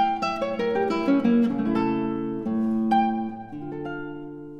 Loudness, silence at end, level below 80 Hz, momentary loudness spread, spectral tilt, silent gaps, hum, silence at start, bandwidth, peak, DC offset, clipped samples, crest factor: -25 LUFS; 0 s; -56 dBFS; 13 LU; -7.5 dB/octave; none; none; 0 s; 7.4 kHz; -10 dBFS; under 0.1%; under 0.1%; 14 dB